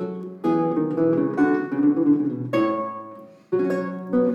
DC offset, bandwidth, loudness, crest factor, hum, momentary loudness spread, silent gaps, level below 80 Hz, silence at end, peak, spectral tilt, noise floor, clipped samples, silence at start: under 0.1%; 7 kHz; -22 LUFS; 14 dB; none; 9 LU; none; -66 dBFS; 0 s; -8 dBFS; -9 dB/octave; -42 dBFS; under 0.1%; 0 s